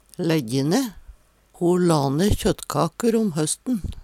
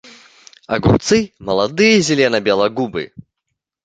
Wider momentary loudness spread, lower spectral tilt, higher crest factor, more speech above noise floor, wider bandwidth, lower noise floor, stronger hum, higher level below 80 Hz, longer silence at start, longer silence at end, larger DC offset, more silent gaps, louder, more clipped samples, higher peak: second, 6 LU vs 11 LU; about the same, -5.5 dB/octave vs -4.5 dB/octave; about the same, 16 dB vs 16 dB; second, 30 dB vs 61 dB; first, 16.5 kHz vs 9.4 kHz; second, -51 dBFS vs -77 dBFS; neither; about the same, -38 dBFS vs -40 dBFS; second, 0.2 s vs 0.7 s; second, 0 s vs 0.8 s; neither; neither; second, -22 LUFS vs -15 LUFS; neither; second, -6 dBFS vs -2 dBFS